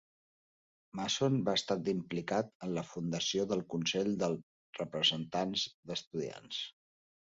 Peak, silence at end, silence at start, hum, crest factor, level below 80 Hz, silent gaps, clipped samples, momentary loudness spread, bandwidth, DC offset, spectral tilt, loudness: -16 dBFS; 0.7 s; 0.95 s; none; 20 dB; -72 dBFS; 2.55-2.60 s, 4.43-4.73 s, 5.74-5.83 s, 6.07-6.11 s; under 0.1%; 10 LU; 7.6 kHz; under 0.1%; -3.5 dB/octave; -35 LUFS